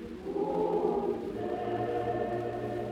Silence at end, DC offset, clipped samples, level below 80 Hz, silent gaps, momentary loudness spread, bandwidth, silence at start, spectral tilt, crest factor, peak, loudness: 0 s; under 0.1%; under 0.1%; -58 dBFS; none; 6 LU; 12 kHz; 0 s; -8 dB/octave; 16 dB; -16 dBFS; -33 LUFS